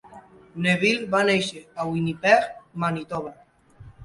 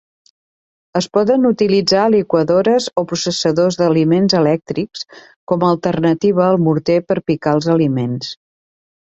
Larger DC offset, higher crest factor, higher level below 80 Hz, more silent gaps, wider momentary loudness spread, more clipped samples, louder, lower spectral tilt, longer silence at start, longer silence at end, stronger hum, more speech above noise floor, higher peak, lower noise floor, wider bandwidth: neither; first, 22 dB vs 14 dB; about the same, -58 dBFS vs -54 dBFS; second, none vs 5.36-5.47 s; first, 14 LU vs 10 LU; neither; second, -23 LUFS vs -15 LUFS; about the same, -5 dB/octave vs -6 dB/octave; second, 0.1 s vs 0.95 s; second, 0 s vs 0.75 s; neither; second, 25 dB vs over 75 dB; about the same, -4 dBFS vs -2 dBFS; second, -49 dBFS vs under -90 dBFS; first, 11.5 kHz vs 8.2 kHz